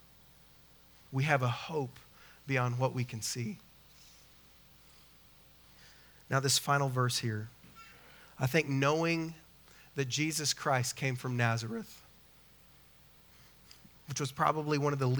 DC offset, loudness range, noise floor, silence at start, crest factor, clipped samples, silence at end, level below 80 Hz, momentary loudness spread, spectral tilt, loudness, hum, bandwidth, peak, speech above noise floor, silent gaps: under 0.1%; 7 LU; -60 dBFS; 1.1 s; 24 dB; under 0.1%; 0 s; -68 dBFS; 23 LU; -4.5 dB/octave; -33 LUFS; none; over 20 kHz; -12 dBFS; 28 dB; none